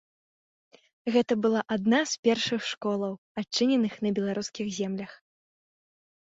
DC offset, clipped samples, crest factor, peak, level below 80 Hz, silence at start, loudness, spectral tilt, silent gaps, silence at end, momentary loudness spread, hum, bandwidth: under 0.1%; under 0.1%; 18 dB; -10 dBFS; -70 dBFS; 1.05 s; -28 LUFS; -4.5 dB/octave; 2.19-2.23 s, 3.18-3.35 s; 1.05 s; 9 LU; none; 8 kHz